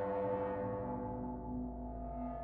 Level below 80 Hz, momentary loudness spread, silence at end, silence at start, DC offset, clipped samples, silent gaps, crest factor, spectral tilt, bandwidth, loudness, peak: -50 dBFS; 7 LU; 0 s; 0 s; under 0.1%; under 0.1%; none; 12 dB; -9 dB/octave; 4 kHz; -41 LUFS; -28 dBFS